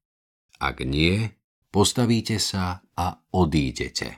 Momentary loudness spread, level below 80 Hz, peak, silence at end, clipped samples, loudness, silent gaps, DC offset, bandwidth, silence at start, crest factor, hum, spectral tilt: 8 LU; -40 dBFS; -4 dBFS; 0 s; under 0.1%; -24 LUFS; 1.44-1.62 s; under 0.1%; 17 kHz; 0.6 s; 20 dB; none; -4.5 dB/octave